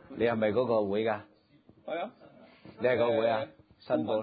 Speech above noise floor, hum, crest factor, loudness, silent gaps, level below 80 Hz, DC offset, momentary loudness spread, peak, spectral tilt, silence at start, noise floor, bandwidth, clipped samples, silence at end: 32 dB; none; 16 dB; -30 LUFS; none; -66 dBFS; under 0.1%; 12 LU; -14 dBFS; -10 dB/octave; 0.1 s; -61 dBFS; 5 kHz; under 0.1%; 0 s